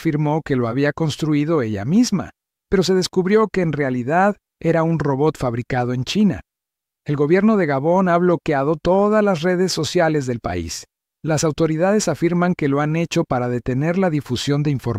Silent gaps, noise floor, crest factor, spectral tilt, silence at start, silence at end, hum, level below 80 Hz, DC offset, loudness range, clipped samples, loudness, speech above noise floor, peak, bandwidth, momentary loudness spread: none; -85 dBFS; 14 dB; -6 dB/octave; 0 s; 0 s; none; -46 dBFS; under 0.1%; 2 LU; under 0.1%; -19 LUFS; 67 dB; -4 dBFS; 15.5 kHz; 7 LU